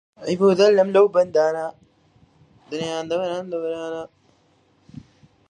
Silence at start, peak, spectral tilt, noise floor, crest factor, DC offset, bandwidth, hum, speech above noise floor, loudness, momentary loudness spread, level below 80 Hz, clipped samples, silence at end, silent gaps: 0.2 s; -4 dBFS; -5.5 dB/octave; -60 dBFS; 18 dB; under 0.1%; 9.6 kHz; none; 41 dB; -20 LUFS; 17 LU; -66 dBFS; under 0.1%; 0.5 s; none